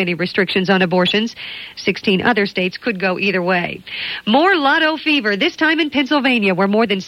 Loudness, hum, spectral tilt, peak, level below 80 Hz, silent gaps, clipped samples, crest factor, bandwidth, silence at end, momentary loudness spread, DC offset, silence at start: -16 LUFS; none; -5.5 dB/octave; -2 dBFS; -56 dBFS; none; under 0.1%; 16 dB; 13 kHz; 0 s; 8 LU; under 0.1%; 0 s